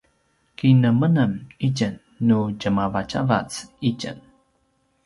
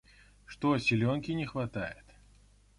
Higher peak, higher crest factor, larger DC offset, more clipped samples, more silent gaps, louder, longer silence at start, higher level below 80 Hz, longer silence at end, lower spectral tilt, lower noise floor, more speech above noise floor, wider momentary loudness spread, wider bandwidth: first, -4 dBFS vs -16 dBFS; about the same, 18 dB vs 16 dB; neither; neither; neither; first, -22 LUFS vs -32 LUFS; about the same, 0.6 s vs 0.5 s; first, -52 dBFS vs -58 dBFS; about the same, 0.85 s vs 0.85 s; about the same, -7 dB/octave vs -6.5 dB/octave; first, -67 dBFS vs -61 dBFS; first, 46 dB vs 30 dB; second, 11 LU vs 17 LU; about the same, 11.5 kHz vs 11.5 kHz